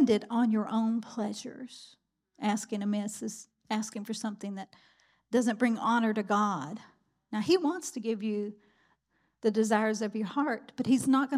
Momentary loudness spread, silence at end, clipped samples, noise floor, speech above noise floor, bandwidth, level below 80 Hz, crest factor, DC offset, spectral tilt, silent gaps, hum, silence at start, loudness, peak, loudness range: 14 LU; 0 s; under 0.1%; -74 dBFS; 45 dB; 14.5 kHz; -80 dBFS; 18 dB; under 0.1%; -5 dB/octave; none; none; 0 s; -31 LUFS; -12 dBFS; 6 LU